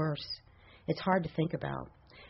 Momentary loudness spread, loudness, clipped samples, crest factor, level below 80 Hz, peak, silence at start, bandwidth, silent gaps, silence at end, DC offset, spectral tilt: 13 LU; -35 LUFS; under 0.1%; 20 dB; -60 dBFS; -14 dBFS; 0 s; 5.8 kHz; none; 0 s; under 0.1%; -5 dB/octave